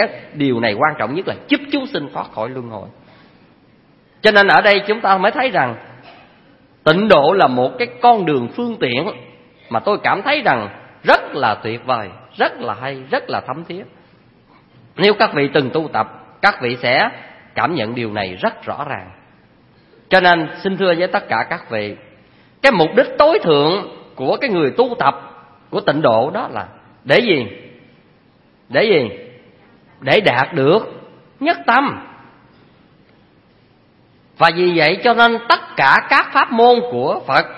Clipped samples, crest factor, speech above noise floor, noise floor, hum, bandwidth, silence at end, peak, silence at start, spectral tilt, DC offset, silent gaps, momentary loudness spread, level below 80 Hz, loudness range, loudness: under 0.1%; 16 dB; 37 dB; -52 dBFS; none; 11 kHz; 0 s; 0 dBFS; 0 s; -6.5 dB/octave; under 0.1%; none; 14 LU; -56 dBFS; 6 LU; -15 LUFS